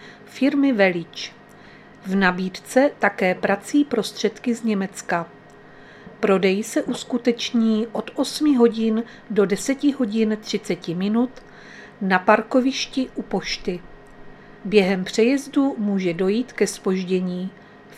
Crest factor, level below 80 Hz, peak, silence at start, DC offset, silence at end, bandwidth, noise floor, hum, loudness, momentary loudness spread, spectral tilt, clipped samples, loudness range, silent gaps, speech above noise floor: 22 dB; -54 dBFS; 0 dBFS; 0 s; under 0.1%; 0 s; 14 kHz; -45 dBFS; none; -21 LUFS; 11 LU; -5 dB/octave; under 0.1%; 2 LU; none; 24 dB